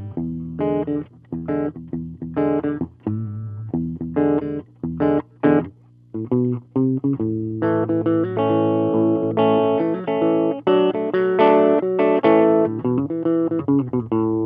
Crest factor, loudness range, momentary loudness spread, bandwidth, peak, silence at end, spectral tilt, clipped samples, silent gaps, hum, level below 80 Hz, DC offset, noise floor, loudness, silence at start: 18 dB; 8 LU; 12 LU; 4.8 kHz; -2 dBFS; 0 s; -11 dB/octave; under 0.1%; none; none; -52 dBFS; under 0.1%; -41 dBFS; -20 LUFS; 0 s